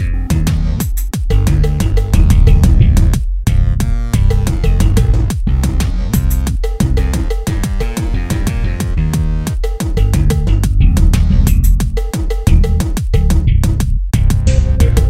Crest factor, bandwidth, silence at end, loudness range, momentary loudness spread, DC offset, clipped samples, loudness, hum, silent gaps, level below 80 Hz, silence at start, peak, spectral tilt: 12 dB; 15.5 kHz; 0 s; 4 LU; 7 LU; under 0.1%; under 0.1%; -15 LUFS; none; none; -12 dBFS; 0 s; 0 dBFS; -6.5 dB/octave